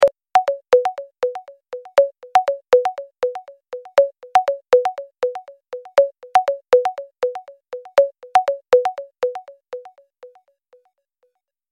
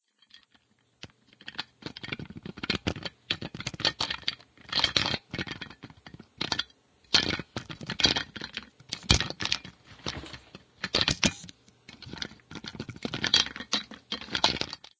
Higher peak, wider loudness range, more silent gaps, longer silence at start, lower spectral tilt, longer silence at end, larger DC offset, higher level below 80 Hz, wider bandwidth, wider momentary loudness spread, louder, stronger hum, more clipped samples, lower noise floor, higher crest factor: about the same, -4 dBFS vs -4 dBFS; about the same, 3 LU vs 5 LU; neither; second, 0 s vs 0.35 s; about the same, -2 dB/octave vs -2.5 dB/octave; first, 1.45 s vs 0.25 s; neither; second, -66 dBFS vs -48 dBFS; first, 11.5 kHz vs 8 kHz; about the same, 19 LU vs 20 LU; first, -19 LUFS vs -29 LUFS; neither; neither; about the same, -68 dBFS vs -67 dBFS; second, 16 dB vs 30 dB